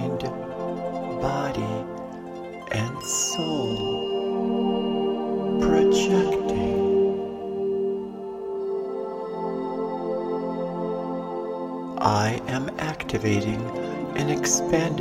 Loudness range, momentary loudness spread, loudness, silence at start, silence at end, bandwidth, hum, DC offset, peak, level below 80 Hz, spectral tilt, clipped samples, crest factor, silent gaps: 6 LU; 10 LU; -26 LUFS; 0 s; 0 s; 16 kHz; none; under 0.1%; -6 dBFS; -50 dBFS; -4.5 dB/octave; under 0.1%; 20 dB; none